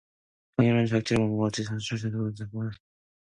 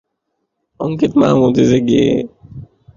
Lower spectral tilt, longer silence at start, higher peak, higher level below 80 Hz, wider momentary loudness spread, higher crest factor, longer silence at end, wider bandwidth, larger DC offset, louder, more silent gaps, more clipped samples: about the same, -6.5 dB/octave vs -7 dB/octave; second, 0.6 s vs 0.8 s; second, -10 dBFS vs 0 dBFS; second, -58 dBFS vs -46 dBFS; about the same, 11 LU vs 11 LU; about the same, 18 dB vs 14 dB; first, 0.5 s vs 0.35 s; first, 11 kHz vs 7.4 kHz; neither; second, -28 LUFS vs -14 LUFS; neither; neither